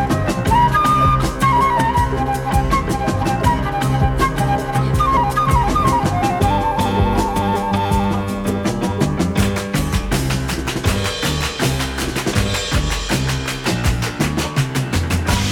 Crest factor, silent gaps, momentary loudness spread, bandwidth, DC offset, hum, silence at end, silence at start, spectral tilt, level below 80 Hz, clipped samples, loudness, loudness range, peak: 16 dB; none; 5 LU; 18.5 kHz; under 0.1%; none; 0 s; 0 s; -5 dB/octave; -26 dBFS; under 0.1%; -18 LUFS; 3 LU; -2 dBFS